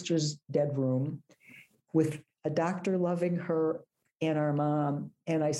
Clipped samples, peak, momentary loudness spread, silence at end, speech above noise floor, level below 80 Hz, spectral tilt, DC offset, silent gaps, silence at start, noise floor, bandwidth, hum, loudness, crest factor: under 0.1%; -14 dBFS; 7 LU; 0 s; 27 dB; -76 dBFS; -6.5 dB/octave; under 0.1%; none; 0 s; -57 dBFS; 12 kHz; none; -31 LUFS; 16 dB